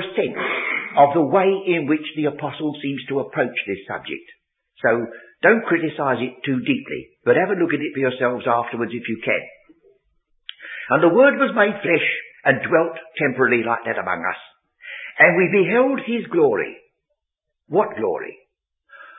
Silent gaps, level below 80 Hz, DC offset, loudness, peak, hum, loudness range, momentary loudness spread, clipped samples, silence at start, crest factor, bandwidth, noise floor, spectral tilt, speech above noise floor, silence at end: none; -66 dBFS; under 0.1%; -20 LUFS; 0 dBFS; none; 5 LU; 14 LU; under 0.1%; 0 s; 20 dB; 4 kHz; -80 dBFS; -10.5 dB/octave; 61 dB; 0 s